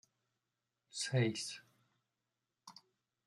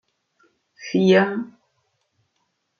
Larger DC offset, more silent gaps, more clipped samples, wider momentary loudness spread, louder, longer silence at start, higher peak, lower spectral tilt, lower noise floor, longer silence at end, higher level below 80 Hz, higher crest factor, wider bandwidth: neither; neither; neither; about the same, 23 LU vs 22 LU; second, -38 LUFS vs -19 LUFS; first, 0.95 s vs 0.8 s; second, -22 dBFS vs -4 dBFS; second, -4.5 dB/octave vs -6.5 dB/octave; first, -89 dBFS vs -73 dBFS; second, 0.55 s vs 1.35 s; second, -82 dBFS vs -72 dBFS; about the same, 22 dB vs 20 dB; first, 12 kHz vs 6.8 kHz